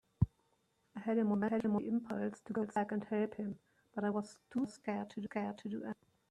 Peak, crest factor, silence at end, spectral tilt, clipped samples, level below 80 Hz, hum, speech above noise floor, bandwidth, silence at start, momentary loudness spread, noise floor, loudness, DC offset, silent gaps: -16 dBFS; 22 dB; 0.4 s; -8 dB/octave; under 0.1%; -62 dBFS; none; 40 dB; 10.5 kHz; 0.2 s; 11 LU; -77 dBFS; -39 LUFS; under 0.1%; none